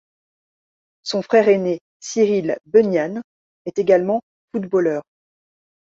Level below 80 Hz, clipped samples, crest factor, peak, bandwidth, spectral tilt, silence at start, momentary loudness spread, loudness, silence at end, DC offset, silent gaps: -66 dBFS; under 0.1%; 18 dB; -2 dBFS; 7.8 kHz; -5.5 dB/octave; 1.05 s; 13 LU; -19 LUFS; 0.85 s; under 0.1%; 1.81-2.00 s, 3.24-3.65 s, 4.23-4.48 s